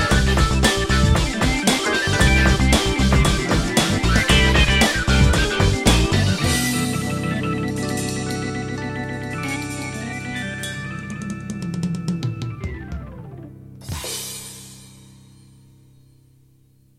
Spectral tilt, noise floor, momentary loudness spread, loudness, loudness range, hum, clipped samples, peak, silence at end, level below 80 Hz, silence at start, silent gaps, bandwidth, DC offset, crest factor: -4.5 dB/octave; -55 dBFS; 15 LU; -20 LUFS; 16 LU; none; under 0.1%; 0 dBFS; 2.1 s; -26 dBFS; 0 s; none; 16 kHz; under 0.1%; 20 dB